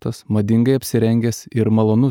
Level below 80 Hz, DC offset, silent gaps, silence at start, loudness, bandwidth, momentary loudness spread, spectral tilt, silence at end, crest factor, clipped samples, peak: -52 dBFS; under 0.1%; none; 0.05 s; -17 LUFS; 18.5 kHz; 6 LU; -7.5 dB/octave; 0 s; 12 dB; under 0.1%; -4 dBFS